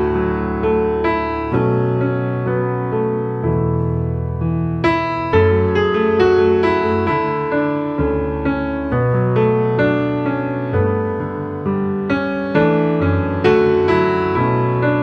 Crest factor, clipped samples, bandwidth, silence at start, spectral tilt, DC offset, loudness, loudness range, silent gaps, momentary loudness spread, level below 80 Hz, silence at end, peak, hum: 14 dB; under 0.1%; 6.6 kHz; 0 s; -9 dB/octave; under 0.1%; -17 LUFS; 3 LU; none; 6 LU; -36 dBFS; 0 s; -2 dBFS; none